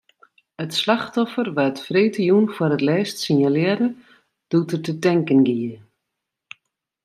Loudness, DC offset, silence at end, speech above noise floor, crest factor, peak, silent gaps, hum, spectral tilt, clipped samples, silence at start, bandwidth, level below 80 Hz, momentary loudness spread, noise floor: -20 LUFS; under 0.1%; 1.3 s; 62 dB; 18 dB; -4 dBFS; none; none; -6 dB/octave; under 0.1%; 0.6 s; 13 kHz; -68 dBFS; 7 LU; -81 dBFS